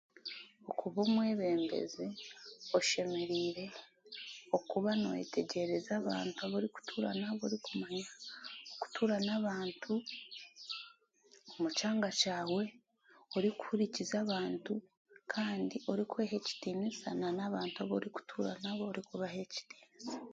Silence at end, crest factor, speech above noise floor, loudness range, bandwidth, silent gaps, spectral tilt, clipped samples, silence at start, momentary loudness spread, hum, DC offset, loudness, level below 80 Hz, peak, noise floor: 0 s; 20 dB; 30 dB; 3 LU; 9 kHz; 14.97-15.05 s; -4.5 dB/octave; under 0.1%; 0.25 s; 14 LU; none; under 0.1%; -38 LUFS; -80 dBFS; -16 dBFS; -67 dBFS